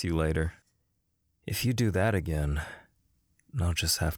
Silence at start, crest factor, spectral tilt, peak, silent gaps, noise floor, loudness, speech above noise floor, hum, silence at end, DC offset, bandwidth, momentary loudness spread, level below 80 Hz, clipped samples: 0 s; 16 dB; -5 dB/octave; -14 dBFS; none; -76 dBFS; -30 LUFS; 47 dB; none; 0 s; under 0.1%; over 20 kHz; 14 LU; -40 dBFS; under 0.1%